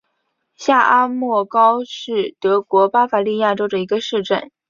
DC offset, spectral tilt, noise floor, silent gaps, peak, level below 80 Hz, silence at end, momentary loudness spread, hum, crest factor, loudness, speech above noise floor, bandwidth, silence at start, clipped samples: under 0.1%; -5 dB/octave; -71 dBFS; none; -2 dBFS; -66 dBFS; 0.25 s; 8 LU; none; 16 dB; -17 LUFS; 54 dB; 7.4 kHz; 0.6 s; under 0.1%